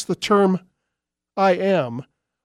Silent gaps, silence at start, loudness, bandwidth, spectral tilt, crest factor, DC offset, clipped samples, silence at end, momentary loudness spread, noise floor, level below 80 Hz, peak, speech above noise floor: none; 0 s; -20 LUFS; 12.5 kHz; -6 dB/octave; 16 dB; under 0.1%; under 0.1%; 0.4 s; 14 LU; -83 dBFS; -66 dBFS; -6 dBFS; 64 dB